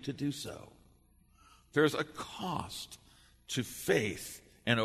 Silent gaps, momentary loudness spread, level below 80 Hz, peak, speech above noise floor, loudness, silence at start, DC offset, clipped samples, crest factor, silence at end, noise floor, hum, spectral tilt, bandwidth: none; 15 LU; -64 dBFS; -14 dBFS; 30 dB; -35 LUFS; 0 s; under 0.1%; under 0.1%; 22 dB; 0 s; -65 dBFS; 60 Hz at -65 dBFS; -4.5 dB/octave; 13.5 kHz